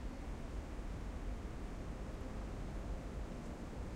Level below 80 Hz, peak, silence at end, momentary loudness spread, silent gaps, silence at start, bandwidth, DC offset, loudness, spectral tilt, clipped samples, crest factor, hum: -46 dBFS; -32 dBFS; 0 s; 1 LU; none; 0 s; 12.5 kHz; under 0.1%; -47 LUFS; -6.5 dB/octave; under 0.1%; 12 dB; none